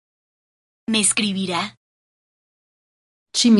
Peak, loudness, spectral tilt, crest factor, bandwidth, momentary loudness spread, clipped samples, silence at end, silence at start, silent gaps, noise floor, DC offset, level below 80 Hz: -4 dBFS; -20 LUFS; -3 dB/octave; 20 dB; 11.5 kHz; 12 LU; under 0.1%; 0 s; 0.9 s; 1.77-3.26 s; under -90 dBFS; under 0.1%; -66 dBFS